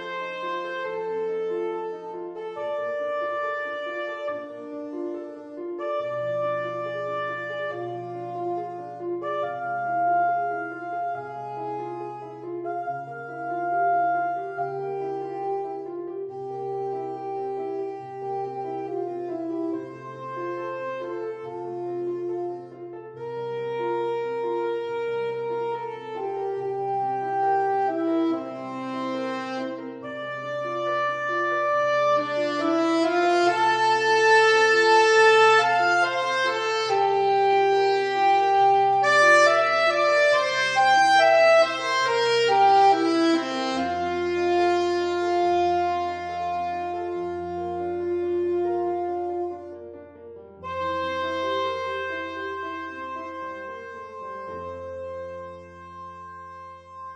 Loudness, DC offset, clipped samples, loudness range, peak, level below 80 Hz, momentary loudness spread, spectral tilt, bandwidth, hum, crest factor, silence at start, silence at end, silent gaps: -24 LUFS; under 0.1%; under 0.1%; 13 LU; -6 dBFS; -66 dBFS; 17 LU; -4 dB/octave; 10 kHz; none; 18 dB; 0 s; 0 s; none